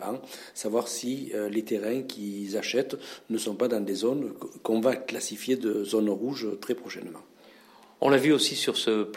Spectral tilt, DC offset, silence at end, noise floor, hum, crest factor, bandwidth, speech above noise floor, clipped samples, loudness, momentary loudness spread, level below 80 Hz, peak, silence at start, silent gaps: -4 dB/octave; under 0.1%; 0 s; -54 dBFS; none; 22 dB; 16.5 kHz; 26 dB; under 0.1%; -28 LUFS; 13 LU; -82 dBFS; -8 dBFS; 0 s; none